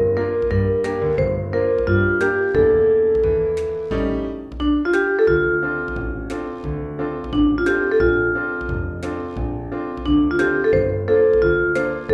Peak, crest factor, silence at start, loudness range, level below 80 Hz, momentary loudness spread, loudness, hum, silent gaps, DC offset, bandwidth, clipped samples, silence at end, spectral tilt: -6 dBFS; 14 dB; 0 s; 3 LU; -34 dBFS; 11 LU; -20 LUFS; none; none; 0.1%; 9.4 kHz; under 0.1%; 0 s; -8 dB/octave